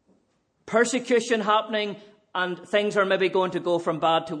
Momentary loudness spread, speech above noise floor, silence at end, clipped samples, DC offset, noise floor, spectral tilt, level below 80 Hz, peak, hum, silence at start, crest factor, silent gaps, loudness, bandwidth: 7 LU; 45 dB; 0 s; under 0.1%; under 0.1%; -69 dBFS; -4 dB/octave; -74 dBFS; -8 dBFS; none; 0.7 s; 18 dB; none; -24 LUFS; 10.5 kHz